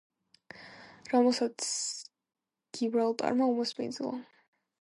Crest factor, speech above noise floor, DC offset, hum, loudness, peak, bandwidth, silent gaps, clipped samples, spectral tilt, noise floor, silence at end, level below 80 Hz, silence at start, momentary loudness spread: 20 dB; 25 dB; under 0.1%; none; -30 LUFS; -14 dBFS; 11.5 kHz; none; under 0.1%; -3 dB/octave; -54 dBFS; 0.6 s; -82 dBFS; 0.55 s; 22 LU